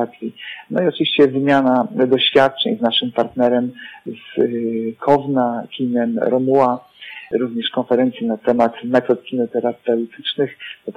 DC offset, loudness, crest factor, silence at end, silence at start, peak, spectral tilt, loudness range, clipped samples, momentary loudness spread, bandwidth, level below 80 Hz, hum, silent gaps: under 0.1%; -18 LUFS; 16 dB; 0.05 s; 0 s; -2 dBFS; -7 dB/octave; 3 LU; under 0.1%; 12 LU; 7.6 kHz; -62 dBFS; none; none